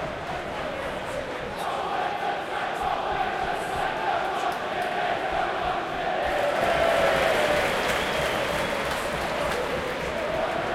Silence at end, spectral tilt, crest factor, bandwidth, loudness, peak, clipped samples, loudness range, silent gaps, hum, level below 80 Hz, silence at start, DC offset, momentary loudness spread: 0 s; -3.5 dB/octave; 16 dB; 16.5 kHz; -26 LUFS; -10 dBFS; under 0.1%; 5 LU; none; none; -46 dBFS; 0 s; under 0.1%; 9 LU